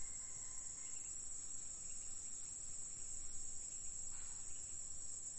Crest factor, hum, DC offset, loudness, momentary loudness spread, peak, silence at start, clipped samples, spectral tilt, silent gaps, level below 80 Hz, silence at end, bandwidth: 12 dB; none; 0.1%; -47 LUFS; 1 LU; -34 dBFS; 0 s; under 0.1%; -0.5 dB/octave; none; -60 dBFS; 0 s; 11 kHz